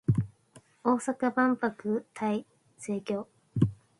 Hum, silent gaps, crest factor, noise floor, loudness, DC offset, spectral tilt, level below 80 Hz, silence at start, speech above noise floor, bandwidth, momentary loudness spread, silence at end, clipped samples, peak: none; none; 20 dB; -59 dBFS; -31 LUFS; under 0.1%; -7.5 dB/octave; -56 dBFS; 0.1 s; 30 dB; 11.5 kHz; 10 LU; 0.25 s; under 0.1%; -10 dBFS